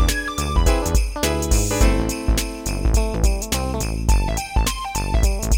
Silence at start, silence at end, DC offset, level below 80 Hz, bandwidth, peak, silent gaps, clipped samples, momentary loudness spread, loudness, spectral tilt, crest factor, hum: 0 s; 0 s; under 0.1%; -20 dBFS; 17 kHz; -4 dBFS; none; under 0.1%; 4 LU; -21 LUFS; -4.5 dB/octave; 16 dB; none